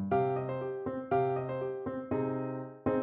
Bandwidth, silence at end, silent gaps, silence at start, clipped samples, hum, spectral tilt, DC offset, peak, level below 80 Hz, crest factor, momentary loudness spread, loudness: 3.9 kHz; 0 s; none; 0 s; under 0.1%; none; -8 dB/octave; under 0.1%; -16 dBFS; -64 dBFS; 16 dB; 7 LU; -34 LUFS